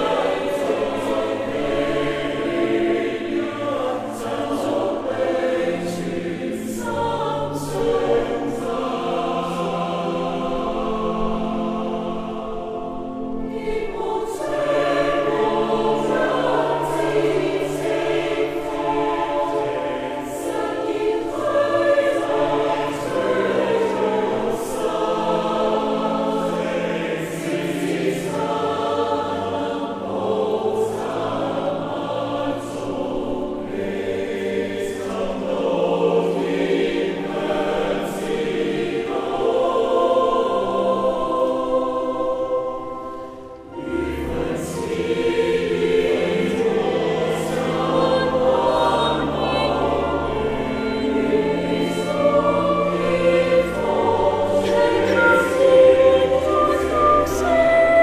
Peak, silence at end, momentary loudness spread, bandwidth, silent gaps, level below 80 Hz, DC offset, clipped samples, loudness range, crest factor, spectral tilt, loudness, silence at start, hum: -2 dBFS; 0 s; 8 LU; 15 kHz; none; -42 dBFS; under 0.1%; under 0.1%; 6 LU; 18 dB; -5.5 dB/octave; -21 LUFS; 0 s; none